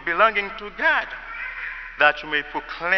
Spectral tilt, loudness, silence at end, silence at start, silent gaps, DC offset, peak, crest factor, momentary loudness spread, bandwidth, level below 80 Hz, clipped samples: -4 dB/octave; -22 LUFS; 0 s; 0 s; none; under 0.1%; -2 dBFS; 20 dB; 13 LU; 6.4 kHz; -50 dBFS; under 0.1%